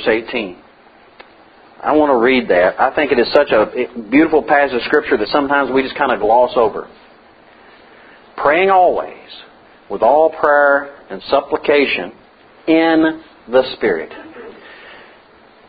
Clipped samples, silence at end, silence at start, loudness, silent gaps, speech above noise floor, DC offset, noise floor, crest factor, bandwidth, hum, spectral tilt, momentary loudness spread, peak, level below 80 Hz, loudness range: under 0.1%; 0.7 s; 0 s; -14 LUFS; none; 32 dB; under 0.1%; -46 dBFS; 16 dB; 5 kHz; none; -7.5 dB/octave; 18 LU; 0 dBFS; -50 dBFS; 4 LU